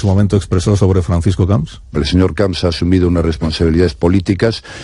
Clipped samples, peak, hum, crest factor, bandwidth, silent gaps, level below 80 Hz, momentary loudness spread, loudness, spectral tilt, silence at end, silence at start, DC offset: under 0.1%; 0 dBFS; none; 12 dB; 11.5 kHz; none; -28 dBFS; 4 LU; -14 LUFS; -7 dB/octave; 0 s; 0 s; under 0.1%